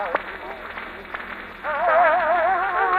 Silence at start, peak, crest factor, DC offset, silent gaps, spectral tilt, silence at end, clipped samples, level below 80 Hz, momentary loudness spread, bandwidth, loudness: 0 s; -8 dBFS; 16 dB; under 0.1%; none; -5.5 dB/octave; 0 s; under 0.1%; -52 dBFS; 16 LU; 13 kHz; -21 LUFS